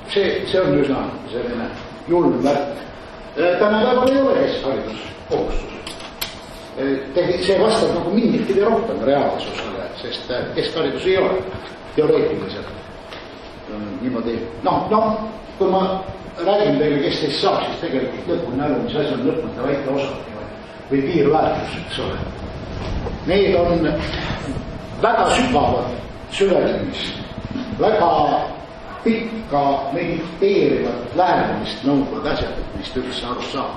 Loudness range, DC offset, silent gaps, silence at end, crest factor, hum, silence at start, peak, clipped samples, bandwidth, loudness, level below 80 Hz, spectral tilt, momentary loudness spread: 4 LU; under 0.1%; none; 0 s; 16 dB; none; 0 s; -4 dBFS; under 0.1%; 12 kHz; -20 LUFS; -38 dBFS; -6 dB/octave; 14 LU